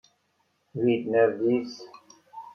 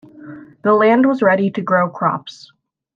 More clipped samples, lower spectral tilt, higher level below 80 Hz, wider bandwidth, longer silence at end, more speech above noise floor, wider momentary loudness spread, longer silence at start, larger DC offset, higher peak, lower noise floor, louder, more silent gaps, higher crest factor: neither; about the same, -7 dB/octave vs -7.5 dB/octave; second, -74 dBFS vs -68 dBFS; about the same, 6.8 kHz vs 7.4 kHz; second, 0 s vs 0.65 s; first, 47 dB vs 22 dB; second, 20 LU vs 24 LU; first, 0.75 s vs 0.15 s; neither; second, -10 dBFS vs -2 dBFS; first, -72 dBFS vs -37 dBFS; second, -25 LUFS vs -15 LUFS; neither; about the same, 18 dB vs 14 dB